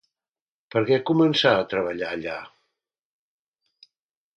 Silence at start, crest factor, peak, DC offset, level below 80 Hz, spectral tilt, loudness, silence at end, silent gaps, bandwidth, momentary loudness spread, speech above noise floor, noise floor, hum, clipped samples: 0.75 s; 22 dB; -4 dBFS; under 0.1%; -64 dBFS; -6 dB/octave; -22 LUFS; 1.9 s; none; 8 kHz; 13 LU; over 68 dB; under -90 dBFS; none; under 0.1%